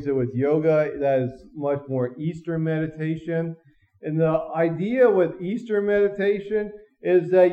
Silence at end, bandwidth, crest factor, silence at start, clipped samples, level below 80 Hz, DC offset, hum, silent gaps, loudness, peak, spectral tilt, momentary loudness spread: 0 s; 7.8 kHz; 16 dB; 0 s; under 0.1%; -58 dBFS; under 0.1%; none; none; -23 LUFS; -6 dBFS; -9.5 dB/octave; 11 LU